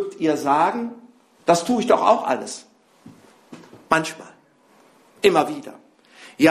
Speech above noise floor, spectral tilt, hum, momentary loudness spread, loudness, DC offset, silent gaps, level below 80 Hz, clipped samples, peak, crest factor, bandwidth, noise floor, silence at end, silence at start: 36 dB; -4.5 dB/octave; none; 16 LU; -20 LUFS; under 0.1%; none; -64 dBFS; under 0.1%; 0 dBFS; 22 dB; 14 kHz; -55 dBFS; 0 s; 0 s